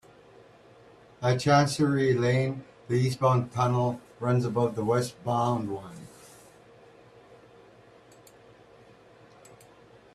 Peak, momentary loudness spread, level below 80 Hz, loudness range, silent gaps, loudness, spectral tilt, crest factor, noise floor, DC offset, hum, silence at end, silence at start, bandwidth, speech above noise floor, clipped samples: -8 dBFS; 13 LU; -62 dBFS; 10 LU; none; -26 LUFS; -6.5 dB/octave; 20 dB; -55 dBFS; under 0.1%; none; 4.1 s; 1.2 s; 13 kHz; 29 dB; under 0.1%